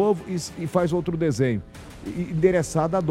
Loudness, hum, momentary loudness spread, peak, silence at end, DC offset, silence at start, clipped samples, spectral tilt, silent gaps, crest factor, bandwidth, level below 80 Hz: -24 LUFS; none; 11 LU; -6 dBFS; 0 s; under 0.1%; 0 s; under 0.1%; -6.5 dB/octave; none; 18 dB; 15.5 kHz; -46 dBFS